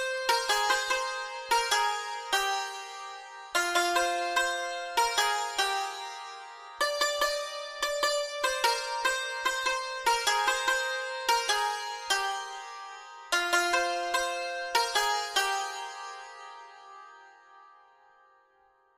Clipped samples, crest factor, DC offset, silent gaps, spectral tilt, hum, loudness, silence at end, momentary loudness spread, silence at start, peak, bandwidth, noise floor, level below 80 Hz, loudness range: under 0.1%; 20 dB; under 0.1%; none; 1.5 dB/octave; none; -28 LUFS; 1.3 s; 16 LU; 0 s; -12 dBFS; 15.5 kHz; -65 dBFS; -64 dBFS; 3 LU